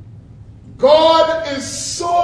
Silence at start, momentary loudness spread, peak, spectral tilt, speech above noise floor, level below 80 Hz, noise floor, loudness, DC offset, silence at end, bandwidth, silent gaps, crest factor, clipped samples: 0 s; 12 LU; 0 dBFS; -3 dB/octave; 25 dB; -46 dBFS; -38 dBFS; -14 LUFS; under 0.1%; 0 s; 11 kHz; none; 16 dB; under 0.1%